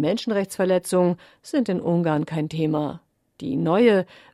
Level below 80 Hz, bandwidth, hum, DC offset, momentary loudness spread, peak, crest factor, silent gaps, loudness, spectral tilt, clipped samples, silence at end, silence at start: -64 dBFS; 14 kHz; none; under 0.1%; 11 LU; -6 dBFS; 16 dB; none; -23 LUFS; -6.5 dB/octave; under 0.1%; 0.3 s; 0 s